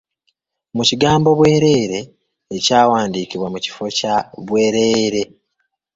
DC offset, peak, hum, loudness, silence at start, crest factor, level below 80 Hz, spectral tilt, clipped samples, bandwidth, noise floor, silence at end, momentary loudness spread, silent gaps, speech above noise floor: under 0.1%; 0 dBFS; none; -16 LUFS; 0.75 s; 16 dB; -50 dBFS; -4.5 dB/octave; under 0.1%; 8 kHz; -71 dBFS; 0.7 s; 11 LU; none; 56 dB